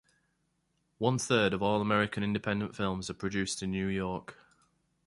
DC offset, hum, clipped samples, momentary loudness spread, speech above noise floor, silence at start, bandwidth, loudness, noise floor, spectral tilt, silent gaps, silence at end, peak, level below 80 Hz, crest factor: under 0.1%; none; under 0.1%; 8 LU; 46 dB; 1 s; 11.5 kHz; -31 LUFS; -77 dBFS; -5 dB/octave; none; 0.75 s; -12 dBFS; -58 dBFS; 20 dB